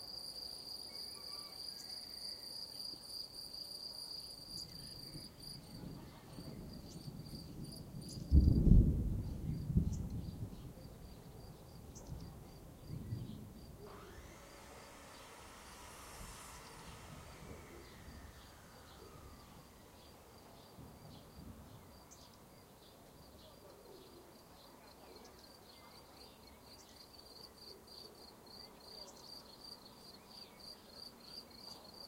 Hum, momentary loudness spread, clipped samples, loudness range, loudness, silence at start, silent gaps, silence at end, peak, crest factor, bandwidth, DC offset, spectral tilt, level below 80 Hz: none; 16 LU; under 0.1%; 22 LU; -43 LUFS; 0 s; none; 0 s; -14 dBFS; 28 dB; 16 kHz; under 0.1%; -6 dB/octave; -46 dBFS